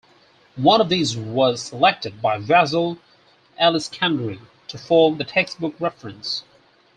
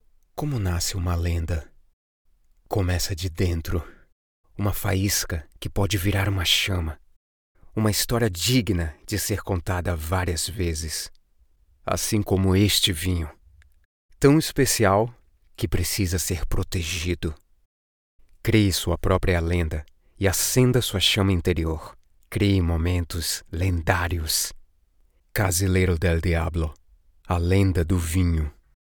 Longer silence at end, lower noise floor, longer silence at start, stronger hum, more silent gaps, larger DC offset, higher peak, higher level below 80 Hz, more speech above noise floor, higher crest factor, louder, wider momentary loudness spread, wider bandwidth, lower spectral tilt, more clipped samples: first, 0.55 s vs 0.4 s; second, -55 dBFS vs -61 dBFS; first, 0.55 s vs 0.35 s; neither; second, none vs 1.93-2.25 s, 4.12-4.44 s, 7.16-7.55 s, 13.85-14.09 s, 17.65-18.19 s; neither; about the same, -2 dBFS vs -4 dBFS; second, -62 dBFS vs -38 dBFS; about the same, 36 dB vs 38 dB; about the same, 18 dB vs 20 dB; first, -20 LUFS vs -24 LUFS; about the same, 13 LU vs 11 LU; second, 10 kHz vs over 20 kHz; about the same, -4.5 dB/octave vs -4.5 dB/octave; neither